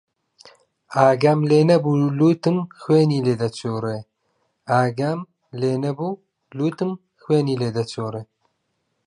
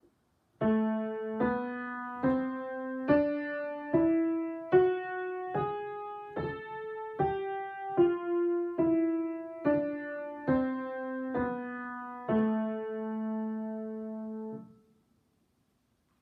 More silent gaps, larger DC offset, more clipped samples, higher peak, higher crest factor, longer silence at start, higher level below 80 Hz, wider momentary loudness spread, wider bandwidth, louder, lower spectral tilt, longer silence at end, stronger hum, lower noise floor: neither; neither; neither; first, -2 dBFS vs -12 dBFS; about the same, 20 dB vs 20 dB; first, 0.9 s vs 0.6 s; about the same, -64 dBFS vs -64 dBFS; about the same, 14 LU vs 12 LU; first, 11 kHz vs 4.6 kHz; first, -20 LUFS vs -32 LUFS; second, -7.5 dB/octave vs -10 dB/octave; second, 0.8 s vs 1.55 s; neither; about the same, -73 dBFS vs -74 dBFS